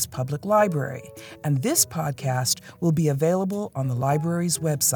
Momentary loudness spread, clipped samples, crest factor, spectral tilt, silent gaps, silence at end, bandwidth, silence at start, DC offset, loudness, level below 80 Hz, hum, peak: 8 LU; under 0.1%; 18 dB; -4.5 dB/octave; none; 0 s; 19.5 kHz; 0 s; under 0.1%; -24 LUFS; -62 dBFS; none; -6 dBFS